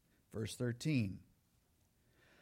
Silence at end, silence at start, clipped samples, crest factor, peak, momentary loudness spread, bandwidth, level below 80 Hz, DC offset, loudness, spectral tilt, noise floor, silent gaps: 1.2 s; 0.3 s; under 0.1%; 18 dB; -26 dBFS; 14 LU; 16.5 kHz; -72 dBFS; under 0.1%; -40 LUFS; -6 dB/octave; -75 dBFS; none